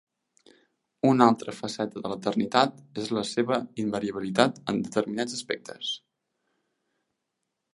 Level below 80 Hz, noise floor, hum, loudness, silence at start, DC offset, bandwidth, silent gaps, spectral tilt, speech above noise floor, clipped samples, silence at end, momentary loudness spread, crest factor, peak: -70 dBFS; -82 dBFS; none; -27 LUFS; 1.05 s; under 0.1%; 11.5 kHz; none; -5 dB/octave; 56 dB; under 0.1%; 1.75 s; 11 LU; 26 dB; -2 dBFS